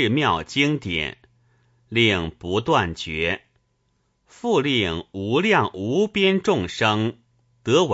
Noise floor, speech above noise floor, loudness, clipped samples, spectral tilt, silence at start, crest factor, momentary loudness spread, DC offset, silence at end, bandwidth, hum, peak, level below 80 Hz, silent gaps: -69 dBFS; 47 dB; -22 LUFS; under 0.1%; -5 dB/octave; 0 s; 18 dB; 8 LU; under 0.1%; 0 s; 8 kHz; none; -4 dBFS; -50 dBFS; none